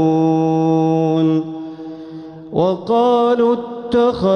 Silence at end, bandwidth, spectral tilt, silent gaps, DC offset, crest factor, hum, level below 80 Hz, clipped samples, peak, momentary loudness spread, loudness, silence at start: 0 s; 6.4 kHz; -8.5 dB/octave; none; under 0.1%; 12 dB; none; -52 dBFS; under 0.1%; -4 dBFS; 17 LU; -16 LUFS; 0 s